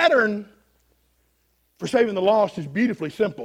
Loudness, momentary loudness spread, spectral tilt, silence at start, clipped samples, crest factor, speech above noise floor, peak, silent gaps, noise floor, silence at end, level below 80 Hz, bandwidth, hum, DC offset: -22 LUFS; 7 LU; -5.5 dB/octave; 0 s; under 0.1%; 18 dB; 45 dB; -6 dBFS; none; -67 dBFS; 0 s; -64 dBFS; 15 kHz; none; under 0.1%